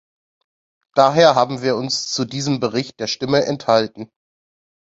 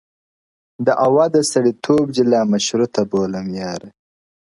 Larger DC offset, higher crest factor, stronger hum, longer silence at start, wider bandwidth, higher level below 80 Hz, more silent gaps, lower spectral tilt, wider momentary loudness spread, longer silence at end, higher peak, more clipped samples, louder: neither; about the same, 18 dB vs 16 dB; neither; first, 0.95 s vs 0.8 s; second, 8 kHz vs 11.5 kHz; about the same, -60 dBFS vs -58 dBFS; neither; about the same, -4.5 dB/octave vs -5 dB/octave; about the same, 11 LU vs 11 LU; first, 0.9 s vs 0.5 s; about the same, 0 dBFS vs -2 dBFS; neither; about the same, -18 LUFS vs -17 LUFS